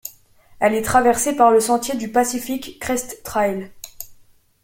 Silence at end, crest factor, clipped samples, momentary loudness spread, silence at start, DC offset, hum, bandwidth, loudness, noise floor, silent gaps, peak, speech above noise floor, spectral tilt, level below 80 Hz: 0.5 s; 18 dB; under 0.1%; 21 LU; 0.05 s; under 0.1%; none; 17 kHz; -19 LUFS; -52 dBFS; none; -2 dBFS; 34 dB; -3.5 dB/octave; -50 dBFS